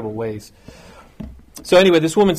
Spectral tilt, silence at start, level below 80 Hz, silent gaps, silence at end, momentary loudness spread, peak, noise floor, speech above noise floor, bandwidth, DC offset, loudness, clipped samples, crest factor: -5 dB/octave; 0 s; -46 dBFS; none; 0 s; 25 LU; -2 dBFS; -36 dBFS; 20 dB; 15.5 kHz; under 0.1%; -15 LUFS; under 0.1%; 16 dB